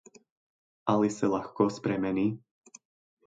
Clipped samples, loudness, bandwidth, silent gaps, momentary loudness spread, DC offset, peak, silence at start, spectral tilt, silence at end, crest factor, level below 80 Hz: under 0.1%; -29 LUFS; 9.2 kHz; none; 6 LU; under 0.1%; -10 dBFS; 0.85 s; -6.5 dB/octave; 0.9 s; 22 dB; -66 dBFS